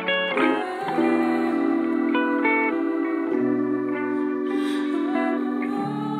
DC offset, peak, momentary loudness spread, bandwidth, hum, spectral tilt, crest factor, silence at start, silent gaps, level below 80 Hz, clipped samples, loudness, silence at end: under 0.1%; -8 dBFS; 5 LU; 10.5 kHz; none; -6 dB/octave; 14 dB; 0 s; none; -76 dBFS; under 0.1%; -23 LUFS; 0 s